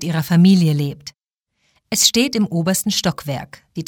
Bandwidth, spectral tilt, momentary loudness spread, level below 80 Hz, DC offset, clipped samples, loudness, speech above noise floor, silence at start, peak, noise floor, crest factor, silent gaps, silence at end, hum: 18.5 kHz; -4.5 dB/octave; 16 LU; -54 dBFS; under 0.1%; under 0.1%; -16 LUFS; 57 dB; 0 s; 0 dBFS; -74 dBFS; 18 dB; none; 0.05 s; none